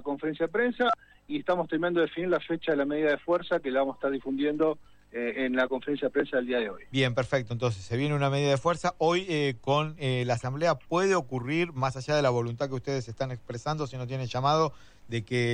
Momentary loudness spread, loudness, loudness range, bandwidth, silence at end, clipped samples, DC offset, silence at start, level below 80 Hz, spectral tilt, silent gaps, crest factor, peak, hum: 8 LU; -29 LUFS; 2 LU; 10 kHz; 0 s; under 0.1%; under 0.1%; 0 s; -58 dBFS; -6 dB/octave; none; 16 dB; -12 dBFS; none